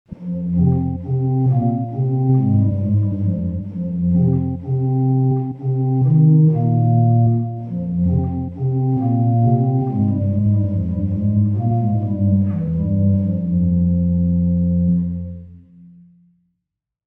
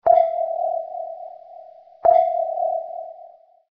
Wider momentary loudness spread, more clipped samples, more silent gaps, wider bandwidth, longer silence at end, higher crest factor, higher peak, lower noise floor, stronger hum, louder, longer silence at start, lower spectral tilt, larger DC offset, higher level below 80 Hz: second, 7 LU vs 22 LU; neither; neither; second, 2.1 kHz vs 3.7 kHz; first, 1.5 s vs 0.45 s; second, 12 dB vs 18 dB; about the same, -4 dBFS vs -4 dBFS; first, -80 dBFS vs -47 dBFS; neither; first, -18 LUFS vs -21 LUFS; about the same, 0.1 s vs 0.05 s; first, -14 dB/octave vs -3.5 dB/octave; neither; first, -40 dBFS vs -64 dBFS